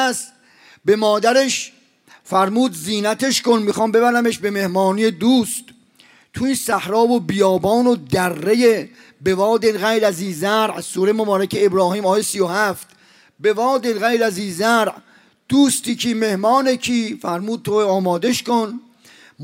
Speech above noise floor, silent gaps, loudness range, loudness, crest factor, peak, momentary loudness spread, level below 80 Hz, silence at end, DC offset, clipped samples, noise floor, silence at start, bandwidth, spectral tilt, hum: 34 dB; none; 2 LU; -18 LUFS; 14 dB; -4 dBFS; 8 LU; -58 dBFS; 0 s; under 0.1%; under 0.1%; -51 dBFS; 0 s; 16 kHz; -4 dB/octave; none